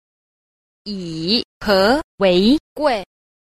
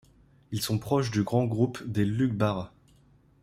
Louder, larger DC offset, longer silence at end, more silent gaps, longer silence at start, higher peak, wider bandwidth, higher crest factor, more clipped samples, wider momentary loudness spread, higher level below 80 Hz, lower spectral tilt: first, -17 LUFS vs -28 LUFS; neither; second, 0.55 s vs 0.75 s; first, 1.45-1.61 s, 2.04-2.18 s, 2.60-2.76 s vs none; first, 0.85 s vs 0.5 s; first, -2 dBFS vs -10 dBFS; about the same, 15 kHz vs 16 kHz; about the same, 16 dB vs 18 dB; neither; first, 14 LU vs 8 LU; first, -46 dBFS vs -58 dBFS; about the same, -5.5 dB/octave vs -6.5 dB/octave